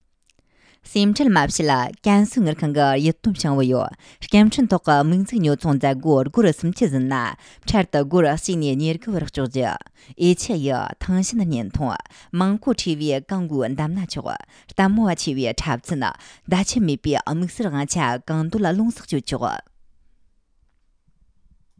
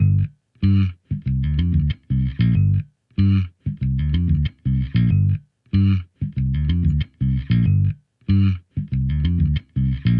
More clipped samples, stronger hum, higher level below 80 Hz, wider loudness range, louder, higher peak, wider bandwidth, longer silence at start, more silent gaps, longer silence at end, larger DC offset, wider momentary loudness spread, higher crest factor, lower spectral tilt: neither; neither; second, -44 dBFS vs -30 dBFS; first, 5 LU vs 1 LU; about the same, -21 LUFS vs -21 LUFS; first, -2 dBFS vs -6 dBFS; first, 10.5 kHz vs 5.2 kHz; first, 0.85 s vs 0 s; neither; first, 2.2 s vs 0 s; neither; about the same, 9 LU vs 7 LU; first, 20 dB vs 12 dB; second, -5.5 dB/octave vs -10.5 dB/octave